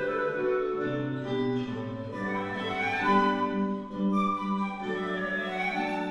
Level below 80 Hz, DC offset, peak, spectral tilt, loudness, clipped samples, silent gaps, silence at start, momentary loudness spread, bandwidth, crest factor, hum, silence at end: -60 dBFS; under 0.1%; -12 dBFS; -7 dB/octave; -29 LUFS; under 0.1%; none; 0 s; 8 LU; 11 kHz; 18 dB; none; 0 s